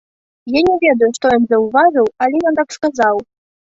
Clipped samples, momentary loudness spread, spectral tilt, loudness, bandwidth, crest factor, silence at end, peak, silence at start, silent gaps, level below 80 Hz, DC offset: under 0.1%; 7 LU; -4.5 dB/octave; -14 LUFS; 8 kHz; 14 dB; 0.55 s; -2 dBFS; 0.45 s; none; -52 dBFS; under 0.1%